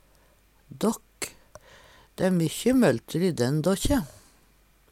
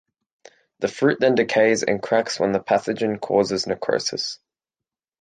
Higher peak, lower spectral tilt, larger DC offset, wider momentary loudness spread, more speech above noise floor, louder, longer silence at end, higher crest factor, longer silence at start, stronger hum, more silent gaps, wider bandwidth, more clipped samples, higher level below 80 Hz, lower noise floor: second, -10 dBFS vs -4 dBFS; first, -5.5 dB/octave vs -4 dB/octave; neither; first, 15 LU vs 10 LU; second, 37 dB vs 68 dB; second, -26 LUFS vs -21 LUFS; about the same, 0.85 s vs 0.85 s; about the same, 18 dB vs 18 dB; about the same, 0.7 s vs 0.8 s; neither; neither; first, 17 kHz vs 9.6 kHz; neither; first, -44 dBFS vs -62 dBFS; second, -60 dBFS vs -89 dBFS